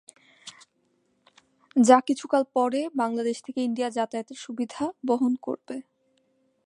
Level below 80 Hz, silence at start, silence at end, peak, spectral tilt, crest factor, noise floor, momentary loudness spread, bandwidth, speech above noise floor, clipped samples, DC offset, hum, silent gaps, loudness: -78 dBFS; 0.45 s; 0.85 s; -4 dBFS; -4.5 dB/octave; 24 dB; -70 dBFS; 20 LU; 11 kHz; 45 dB; under 0.1%; under 0.1%; none; none; -25 LUFS